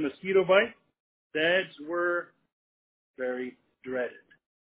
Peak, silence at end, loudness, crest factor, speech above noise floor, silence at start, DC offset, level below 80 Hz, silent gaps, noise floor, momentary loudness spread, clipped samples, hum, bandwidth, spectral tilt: -10 dBFS; 0.5 s; -28 LUFS; 20 dB; over 62 dB; 0 s; under 0.1%; -74 dBFS; 1.00-1.30 s, 2.52-3.14 s; under -90 dBFS; 14 LU; under 0.1%; none; 4 kHz; -2 dB/octave